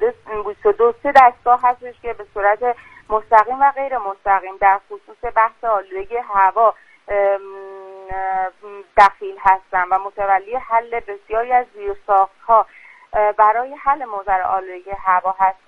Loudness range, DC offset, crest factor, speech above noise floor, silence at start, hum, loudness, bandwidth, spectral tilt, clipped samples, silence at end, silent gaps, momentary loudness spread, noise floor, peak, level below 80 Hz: 3 LU; under 0.1%; 18 dB; 19 dB; 0 s; none; -17 LUFS; 9.4 kHz; -5 dB/octave; under 0.1%; 0.15 s; none; 14 LU; -36 dBFS; 0 dBFS; -46 dBFS